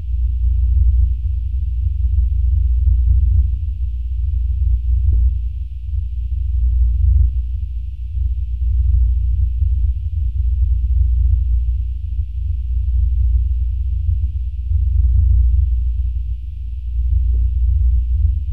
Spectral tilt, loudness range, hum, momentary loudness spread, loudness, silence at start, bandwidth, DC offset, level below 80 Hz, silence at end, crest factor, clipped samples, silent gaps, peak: -10 dB/octave; 2 LU; none; 8 LU; -19 LUFS; 0 s; 0.4 kHz; 3%; -16 dBFS; 0 s; 12 dB; under 0.1%; none; -6 dBFS